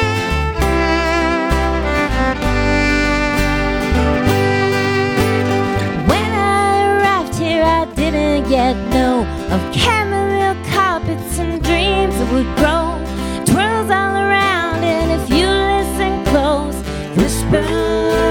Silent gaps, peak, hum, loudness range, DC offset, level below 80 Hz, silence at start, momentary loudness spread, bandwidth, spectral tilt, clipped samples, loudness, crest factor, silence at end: none; 0 dBFS; none; 1 LU; under 0.1%; -24 dBFS; 0 s; 4 LU; 19 kHz; -5 dB/octave; under 0.1%; -15 LUFS; 14 dB; 0 s